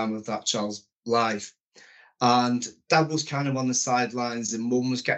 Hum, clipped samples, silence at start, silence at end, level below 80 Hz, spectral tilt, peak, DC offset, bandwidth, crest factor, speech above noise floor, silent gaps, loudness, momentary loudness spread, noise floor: none; under 0.1%; 0 s; 0 s; -74 dBFS; -4 dB/octave; -6 dBFS; under 0.1%; 8.2 kHz; 20 dB; 29 dB; 0.92-0.96 s, 1.60-1.71 s; -25 LUFS; 8 LU; -54 dBFS